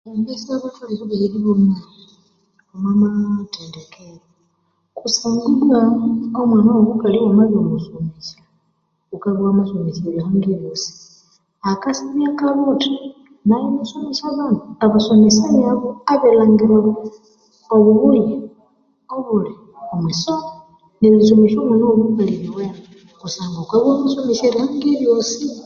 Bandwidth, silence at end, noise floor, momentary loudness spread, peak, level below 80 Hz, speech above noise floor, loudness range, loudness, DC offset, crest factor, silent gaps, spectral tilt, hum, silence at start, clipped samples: 7.2 kHz; 0 s; -66 dBFS; 16 LU; -2 dBFS; -56 dBFS; 51 dB; 7 LU; -16 LUFS; under 0.1%; 16 dB; none; -6 dB/octave; none; 0.05 s; under 0.1%